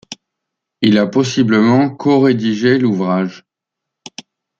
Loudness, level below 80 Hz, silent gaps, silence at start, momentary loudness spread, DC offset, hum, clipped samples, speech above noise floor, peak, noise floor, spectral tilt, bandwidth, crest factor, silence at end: -14 LUFS; -58 dBFS; none; 0.1 s; 22 LU; under 0.1%; none; under 0.1%; 68 dB; -2 dBFS; -81 dBFS; -6.5 dB/octave; 7.6 kHz; 14 dB; 1.2 s